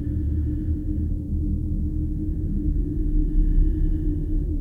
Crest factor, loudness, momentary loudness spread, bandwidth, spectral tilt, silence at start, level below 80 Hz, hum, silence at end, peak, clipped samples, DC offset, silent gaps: 12 dB; -26 LUFS; 3 LU; 1.8 kHz; -12 dB/octave; 0 s; -24 dBFS; none; 0 s; -10 dBFS; under 0.1%; under 0.1%; none